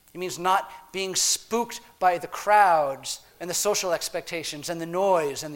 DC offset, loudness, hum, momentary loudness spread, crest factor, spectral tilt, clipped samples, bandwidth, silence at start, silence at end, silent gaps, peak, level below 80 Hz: under 0.1%; -25 LUFS; none; 13 LU; 20 dB; -2 dB/octave; under 0.1%; 16.5 kHz; 0.15 s; 0 s; none; -6 dBFS; -62 dBFS